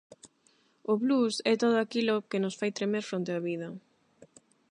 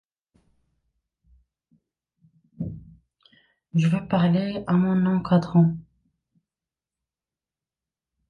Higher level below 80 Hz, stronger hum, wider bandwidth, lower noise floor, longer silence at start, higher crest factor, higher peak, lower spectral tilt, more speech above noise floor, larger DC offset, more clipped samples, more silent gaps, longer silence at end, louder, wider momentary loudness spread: second, -82 dBFS vs -58 dBFS; neither; first, 10.5 kHz vs 6.8 kHz; second, -68 dBFS vs under -90 dBFS; second, 0.1 s vs 2.6 s; about the same, 18 dB vs 20 dB; second, -12 dBFS vs -6 dBFS; second, -5 dB/octave vs -9 dB/octave; second, 39 dB vs over 69 dB; neither; neither; neither; second, 0.45 s vs 2.5 s; second, -29 LUFS vs -23 LUFS; second, 11 LU vs 15 LU